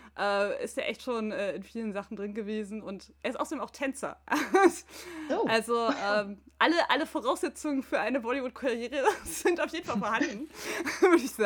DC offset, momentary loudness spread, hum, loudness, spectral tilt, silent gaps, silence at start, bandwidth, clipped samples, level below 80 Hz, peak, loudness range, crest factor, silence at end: under 0.1%; 13 LU; none; -30 LUFS; -3.5 dB/octave; none; 0.05 s; 20 kHz; under 0.1%; -64 dBFS; -8 dBFS; 7 LU; 22 dB; 0 s